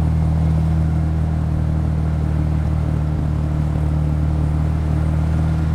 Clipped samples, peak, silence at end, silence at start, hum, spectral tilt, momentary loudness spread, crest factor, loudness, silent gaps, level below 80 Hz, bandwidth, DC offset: under 0.1%; -6 dBFS; 0 s; 0 s; none; -9.5 dB/octave; 2 LU; 10 dB; -19 LUFS; none; -22 dBFS; 5.8 kHz; under 0.1%